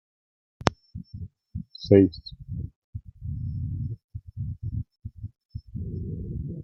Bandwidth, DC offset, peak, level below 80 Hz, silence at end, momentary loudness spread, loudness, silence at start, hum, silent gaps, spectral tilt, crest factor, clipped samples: 8.4 kHz; under 0.1%; 0 dBFS; -44 dBFS; 0 s; 23 LU; -28 LUFS; 0.6 s; none; 2.76-2.93 s, 4.04-4.09 s, 5.45-5.49 s; -7.5 dB/octave; 28 dB; under 0.1%